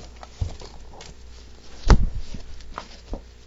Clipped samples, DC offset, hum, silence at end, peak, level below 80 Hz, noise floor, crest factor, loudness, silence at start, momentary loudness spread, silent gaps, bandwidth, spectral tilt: under 0.1%; under 0.1%; none; 0.25 s; -2 dBFS; -28 dBFS; -42 dBFS; 24 dB; -27 LUFS; 0 s; 25 LU; none; 7.8 kHz; -6 dB/octave